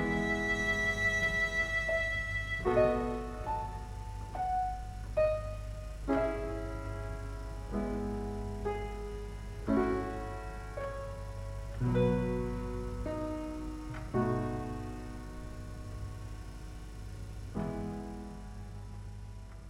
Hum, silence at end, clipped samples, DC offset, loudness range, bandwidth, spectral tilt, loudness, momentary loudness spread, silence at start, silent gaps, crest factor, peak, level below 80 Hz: none; 0 s; under 0.1%; under 0.1%; 12 LU; 15 kHz; -6 dB/octave; -35 LUFS; 16 LU; 0 s; none; 20 dB; -16 dBFS; -44 dBFS